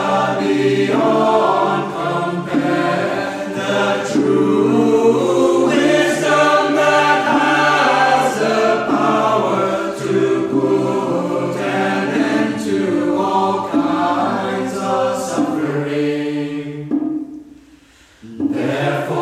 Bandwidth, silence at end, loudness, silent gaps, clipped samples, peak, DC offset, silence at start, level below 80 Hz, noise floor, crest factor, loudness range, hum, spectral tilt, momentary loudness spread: 14.5 kHz; 0 s; -16 LUFS; none; under 0.1%; -2 dBFS; under 0.1%; 0 s; -58 dBFS; -47 dBFS; 14 dB; 7 LU; none; -5.5 dB/octave; 8 LU